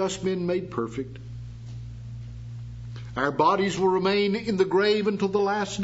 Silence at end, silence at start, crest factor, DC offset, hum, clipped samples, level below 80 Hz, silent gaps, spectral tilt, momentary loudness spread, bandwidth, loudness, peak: 0 s; 0 s; 18 dB; under 0.1%; none; under 0.1%; -50 dBFS; none; -5.5 dB/octave; 17 LU; 8 kHz; -25 LUFS; -8 dBFS